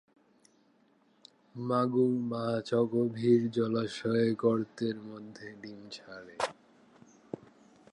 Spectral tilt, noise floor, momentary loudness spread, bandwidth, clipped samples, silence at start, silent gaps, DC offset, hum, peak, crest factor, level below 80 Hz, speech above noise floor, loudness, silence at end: -7 dB/octave; -67 dBFS; 19 LU; 11 kHz; under 0.1%; 1.55 s; none; under 0.1%; none; -12 dBFS; 20 dB; -76 dBFS; 37 dB; -31 LUFS; 1.4 s